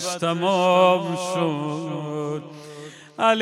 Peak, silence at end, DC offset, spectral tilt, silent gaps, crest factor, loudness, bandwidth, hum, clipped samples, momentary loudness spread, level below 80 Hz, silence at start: -4 dBFS; 0 s; under 0.1%; -5 dB/octave; none; 18 dB; -22 LUFS; 14 kHz; none; under 0.1%; 22 LU; -76 dBFS; 0 s